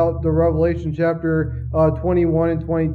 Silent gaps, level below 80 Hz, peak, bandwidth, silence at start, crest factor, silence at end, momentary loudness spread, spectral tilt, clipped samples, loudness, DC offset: none; -34 dBFS; -6 dBFS; 4.7 kHz; 0 s; 14 dB; 0 s; 4 LU; -11 dB/octave; under 0.1%; -19 LUFS; under 0.1%